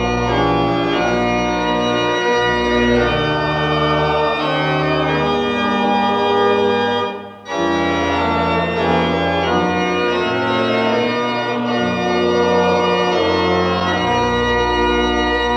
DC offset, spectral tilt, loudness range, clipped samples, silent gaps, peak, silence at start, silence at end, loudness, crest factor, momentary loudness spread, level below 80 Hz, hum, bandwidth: under 0.1%; -5.5 dB/octave; 1 LU; under 0.1%; none; -4 dBFS; 0 s; 0 s; -16 LUFS; 12 dB; 3 LU; -36 dBFS; none; 9 kHz